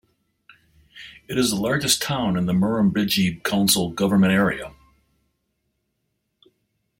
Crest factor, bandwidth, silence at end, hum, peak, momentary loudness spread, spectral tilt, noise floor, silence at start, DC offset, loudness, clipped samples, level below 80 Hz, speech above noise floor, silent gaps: 20 dB; 16.5 kHz; 2.3 s; none; -4 dBFS; 14 LU; -4 dB/octave; -75 dBFS; 0.95 s; under 0.1%; -21 LUFS; under 0.1%; -52 dBFS; 54 dB; none